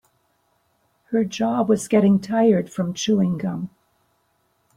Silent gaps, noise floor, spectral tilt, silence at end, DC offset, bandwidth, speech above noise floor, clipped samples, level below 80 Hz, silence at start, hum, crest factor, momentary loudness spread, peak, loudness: none; -67 dBFS; -6.5 dB/octave; 1.1 s; under 0.1%; 13 kHz; 47 dB; under 0.1%; -62 dBFS; 1.1 s; none; 18 dB; 10 LU; -4 dBFS; -21 LUFS